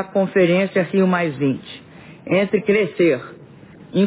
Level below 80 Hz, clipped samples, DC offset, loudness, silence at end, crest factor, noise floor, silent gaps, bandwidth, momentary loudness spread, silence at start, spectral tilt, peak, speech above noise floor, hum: -60 dBFS; under 0.1%; under 0.1%; -19 LUFS; 0 s; 14 dB; -42 dBFS; none; 4 kHz; 19 LU; 0 s; -11 dB/octave; -4 dBFS; 24 dB; none